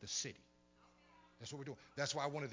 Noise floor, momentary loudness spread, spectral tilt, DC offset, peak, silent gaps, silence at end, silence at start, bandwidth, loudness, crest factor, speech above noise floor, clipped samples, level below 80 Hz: -70 dBFS; 13 LU; -3 dB/octave; under 0.1%; -26 dBFS; none; 0 s; 0 s; 7.8 kHz; -44 LUFS; 22 dB; 26 dB; under 0.1%; -76 dBFS